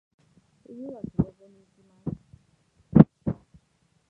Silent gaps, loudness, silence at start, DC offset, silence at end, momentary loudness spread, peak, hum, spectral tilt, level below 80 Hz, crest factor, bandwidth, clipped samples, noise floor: none; -24 LUFS; 0.75 s; under 0.1%; 0.75 s; 22 LU; 0 dBFS; none; -12 dB/octave; -50 dBFS; 26 dB; 3.8 kHz; under 0.1%; -68 dBFS